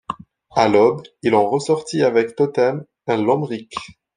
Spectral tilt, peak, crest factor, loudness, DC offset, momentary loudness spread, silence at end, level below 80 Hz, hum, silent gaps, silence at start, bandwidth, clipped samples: -6 dB/octave; 0 dBFS; 18 dB; -19 LUFS; under 0.1%; 14 LU; 0.25 s; -60 dBFS; none; none; 0.1 s; 10.5 kHz; under 0.1%